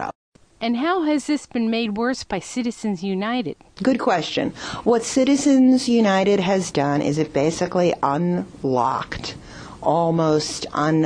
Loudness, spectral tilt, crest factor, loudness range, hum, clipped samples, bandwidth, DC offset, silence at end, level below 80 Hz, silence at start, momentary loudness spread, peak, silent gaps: -21 LUFS; -5.5 dB/octave; 16 dB; 5 LU; none; under 0.1%; 10 kHz; under 0.1%; 0 s; -52 dBFS; 0 s; 10 LU; -6 dBFS; 0.15-0.32 s